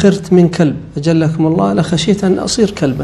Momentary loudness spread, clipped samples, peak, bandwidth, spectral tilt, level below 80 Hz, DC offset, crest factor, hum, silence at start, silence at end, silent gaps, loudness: 4 LU; 0.2%; 0 dBFS; 11.5 kHz; -6 dB/octave; -40 dBFS; under 0.1%; 12 dB; none; 0 s; 0 s; none; -13 LUFS